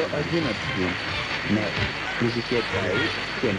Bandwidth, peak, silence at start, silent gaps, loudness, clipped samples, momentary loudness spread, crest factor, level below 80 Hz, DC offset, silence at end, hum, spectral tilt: 10 kHz; -10 dBFS; 0 s; none; -25 LUFS; under 0.1%; 2 LU; 16 dB; -48 dBFS; under 0.1%; 0 s; none; -5 dB/octave